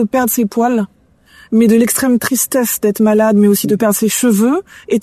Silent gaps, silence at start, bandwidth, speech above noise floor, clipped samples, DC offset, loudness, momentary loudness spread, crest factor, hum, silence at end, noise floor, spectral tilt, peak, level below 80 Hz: none; 0 s; 14 kHz; 34 dB; under 0.1%; under 0.1%; -13 LUFS; 6 LU; 12 dB; none; 0 s; -46 dBFS; -4.5 dB/octave; -2 dBFS; -54 dBFS